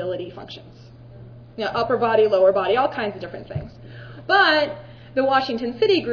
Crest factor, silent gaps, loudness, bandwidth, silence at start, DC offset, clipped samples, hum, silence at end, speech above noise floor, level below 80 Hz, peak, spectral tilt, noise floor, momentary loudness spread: 18 dB; none; -20 LUFS; 5.4 kHz; 0 s; under 0.1%; under 0.1%; none; 0 s; 21 dB; -52 dBFS; -4 dBFS; -6 dB/octave; -42 dBFS; 22 LU